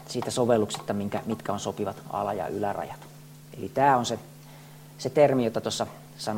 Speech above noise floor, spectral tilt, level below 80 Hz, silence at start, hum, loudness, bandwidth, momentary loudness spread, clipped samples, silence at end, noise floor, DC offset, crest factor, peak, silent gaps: 20 dB; -5 dB/octave; -64 dBFS; 0 s; none; -27 LUFS; 16.5 kHz; 25 LU; under 0.1%; 0 s; -47 dBFS; under 0.1%; 20 dB; -8 dBFS; none